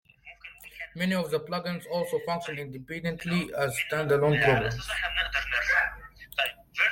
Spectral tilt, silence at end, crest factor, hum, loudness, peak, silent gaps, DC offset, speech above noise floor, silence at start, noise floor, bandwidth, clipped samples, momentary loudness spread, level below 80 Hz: -5 dB/octave; 0 s; 18 dB; none; -28 LUFS; -10 dBFS; none; under 0.1%; 21 dB; 0.25 s; -49 dBFS; 16.5 kHz; under 0.1%; 16 LU; -50 dBFS